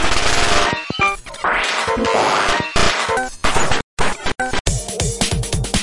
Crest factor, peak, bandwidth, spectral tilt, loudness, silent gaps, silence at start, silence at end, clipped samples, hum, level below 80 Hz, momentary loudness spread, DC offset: 16 dB; 0 dBFS; 11.5 kHz; -3 dB/octave; -18 LUFS; 3.83-3.97 s, 4.60-4.65 s; 0 s; 0 s; under 0.1%; none; -28 dBFS; 6 LU; under 0.1%